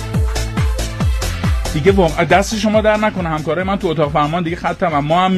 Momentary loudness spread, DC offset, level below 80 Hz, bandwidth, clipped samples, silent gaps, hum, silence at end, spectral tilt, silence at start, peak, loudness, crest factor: 6 LU; under 0.1%; -24 dBFS; 13.5 kHz; under 0.1%; none; none; 0 s; -5.5 dB/octave; 0 s; 0 dBFS; -16 LUFS; 16 dB